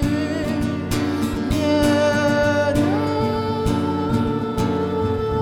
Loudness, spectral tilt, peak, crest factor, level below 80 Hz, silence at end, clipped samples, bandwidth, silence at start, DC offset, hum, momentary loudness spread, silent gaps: -20 LUFS; -6.5 dB/octave; -6 dBFS; 14 dB; -36 dBFS; 0 s; under 0.1%; 18 kHz; 0 s; under 0.1%; none; 5 LU; none